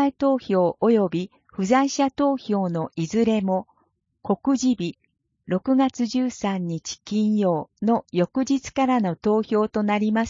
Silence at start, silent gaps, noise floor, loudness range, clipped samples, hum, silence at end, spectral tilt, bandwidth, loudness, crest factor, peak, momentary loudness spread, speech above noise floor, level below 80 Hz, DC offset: 0 s; none; -68 dBFS; 3 LU; under 0.1%; none; 0 s; -6 dB/octave; 7.6 kHz; -23 LUFS; 16 dB; -6 dBFS; 7 LU; 46 dB; -60 dBFS; under 0.1%